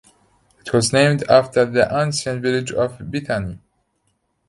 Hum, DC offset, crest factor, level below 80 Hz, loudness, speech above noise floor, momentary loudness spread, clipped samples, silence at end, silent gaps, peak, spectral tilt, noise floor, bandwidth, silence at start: none; under 0.1%; 20 dB; -48 dBFS; -18 LUFS; 50 dB; 10 LU; under 0.1%; 0.9 s; none; 0 dBFS; -5 dB/octave; -68 dBFS; 11.5 kHz; 0.65 s